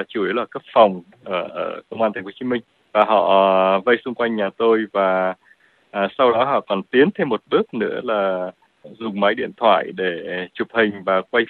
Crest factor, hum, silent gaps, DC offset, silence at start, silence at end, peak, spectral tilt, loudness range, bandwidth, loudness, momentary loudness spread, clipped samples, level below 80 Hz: 20 dB; none; none; under 0.1%; 0 s; 0.05 s; 0 dBFS; -8 dB/octave; 3 LU; 4.4 kHz; -19 LUFS; 11 LU; under 0.1%; -66 dBFS